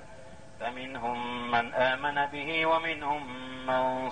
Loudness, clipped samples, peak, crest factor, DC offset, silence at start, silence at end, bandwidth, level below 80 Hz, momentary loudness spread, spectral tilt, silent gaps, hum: -30 LUFS; under 0.1%; -14 dBFS; 16 dB; 0.4%; 0 s; 0 s; 9.8 kHz; -60 dBFS; 12 LU; -5 dB/octave; none; none